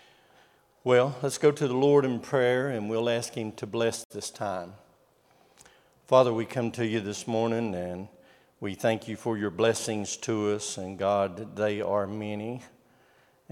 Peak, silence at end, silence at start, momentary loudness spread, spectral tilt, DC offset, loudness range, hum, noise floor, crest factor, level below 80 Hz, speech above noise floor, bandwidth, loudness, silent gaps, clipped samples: -8 dBFS; 0.85 s; 0.85 s; 13 LU; -5 dB/octave; under 0.1%; 5 LU; none; -63 dBFS; 22 dB; -74 dBFS; 36 dB; 15.5 kHz; -28 LUFS; 4.05-4.10 s; under 0.1%